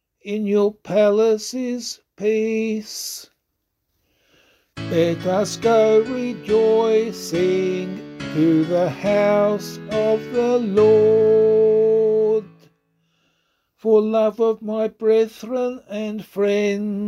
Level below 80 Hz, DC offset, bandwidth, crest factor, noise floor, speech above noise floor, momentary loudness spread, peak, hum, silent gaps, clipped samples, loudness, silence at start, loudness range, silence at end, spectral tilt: -60 dBFS; under 0.1%; 14 kHz; 14 dB; -75 dBFS; 56 dB; 12 LU; -4 dBFS; none; none; under 0.1%; -19 LUFS; 0.25 s; 8 LU; 0 s; -5.5 dB/octave